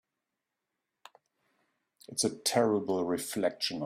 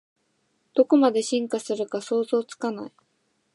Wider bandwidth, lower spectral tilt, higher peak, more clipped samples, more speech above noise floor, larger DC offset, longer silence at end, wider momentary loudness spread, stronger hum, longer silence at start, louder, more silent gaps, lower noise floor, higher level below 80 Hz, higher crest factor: first, 16 kHz vs 11.5 kHz; about the same, -3.5 dB/octave vs -4.5 dB/octave; second, -12 dBFS vs -6 dBFS; neither; first, 56 dB vs 48 dB; neither; second, 0 s vs 0.65 s; second, 5 LU vs 12 LU; neither; first, 2.1 s vs 0.75 s; second, -31 LUFS vs -24 LUFS; neither; first, -87 dBFS vs -71 dBFS; first, -74 dBFS vs -82 dBFS; about the same, 22 dB vs 20 dB